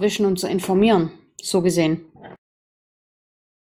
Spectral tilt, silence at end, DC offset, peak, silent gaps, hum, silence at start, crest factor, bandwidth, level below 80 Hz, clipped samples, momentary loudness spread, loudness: -5.5 dB/octave; 1.45 s; under 0.1%; -6 dBFS; none; none; 0 s; 16 dB; 16.5 kHz; -54 dBFS; under 0.1%; 12 LU; -20 LUFS